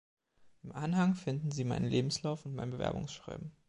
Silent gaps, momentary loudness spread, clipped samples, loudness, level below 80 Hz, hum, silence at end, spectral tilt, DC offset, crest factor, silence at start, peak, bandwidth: none; 13 LU; under 0.1%; -35 LUFS; -60 dBFS; none; 0.2 s; -6 dB/octave; under 0.1%; 16 dB; 0.4 s; -18 dBFS; 11 kHz